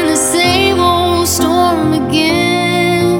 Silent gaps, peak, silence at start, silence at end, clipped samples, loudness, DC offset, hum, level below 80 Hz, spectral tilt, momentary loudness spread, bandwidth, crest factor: none; 0 dBFS; 0 s; 0 s; under 0.1%; -11 LUFS; under 0.1%; none; -36 dBFS; -3.5 dB/octave; 2 LU; 18 kHz; 12 dB